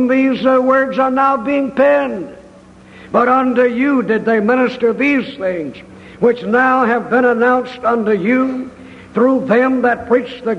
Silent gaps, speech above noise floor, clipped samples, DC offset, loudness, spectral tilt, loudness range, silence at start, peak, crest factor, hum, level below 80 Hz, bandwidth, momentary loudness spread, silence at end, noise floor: none; 27 dB; under 0.1%; under 0.1%; -14 LUFS; -7 dB/octave; 1 LU; 0 s; 0 dBFS; 14 dB; none; -52 dBFS; 7.8 kHz; 8 LU; 0 s; -41 dBFS